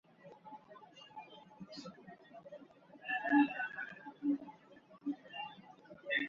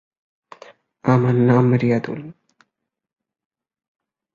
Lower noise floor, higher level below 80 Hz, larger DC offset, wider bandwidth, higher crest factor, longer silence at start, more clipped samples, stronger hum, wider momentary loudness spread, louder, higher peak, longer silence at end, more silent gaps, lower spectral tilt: second, -61 dBFS vs -79 dBFS; second, -84 dBFS vs -58 dBFS; neither; about the same, 7.2 kHz vs 7 kHz; about the same, 22 dB vs 18 dB; second, 0.25 s vs 1.05 s; neither; neither; first, 25 LU vs 13 LU; second, -38 LUFS vs -17 LUFS; second, -18 dBFS vs -2 dBFS; second, 0 s vs 2.05 s; neither; second, -2 dB/octave vs -9.5 dB/octave